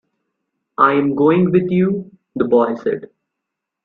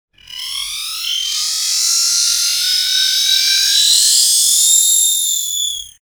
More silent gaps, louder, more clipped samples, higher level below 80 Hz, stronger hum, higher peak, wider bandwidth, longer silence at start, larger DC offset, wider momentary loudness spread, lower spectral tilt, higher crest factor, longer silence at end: neither; second, -16 LUFS vs -11 LUFS; neither; about the same, -58 dBFS vs -56 dBFS; neither; about the same, 0 dBFS vs 0 dBFS; second, 4.3 kHz vs over 20 kHz; first, 0.8 s vs 0.3 s; neither; about the same, 13 LU vs 12 LU; first, -10 dB/octave vs 6 dB/octave; about the same, 18 dB vs 14 dB; first, 0.8 s vs 0.15 s